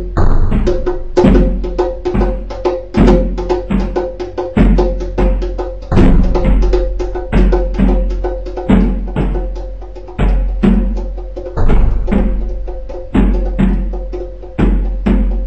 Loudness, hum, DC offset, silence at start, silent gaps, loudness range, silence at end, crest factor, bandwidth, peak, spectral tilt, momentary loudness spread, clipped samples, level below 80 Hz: -15 LUFS; none; 2%; 0 s; none; 3 LU; 0 s; 12 dB; 6.4 kHz; 0 dBFS; -8.5 dB/octave; 12 LU; under 0.1%; -14 dBFS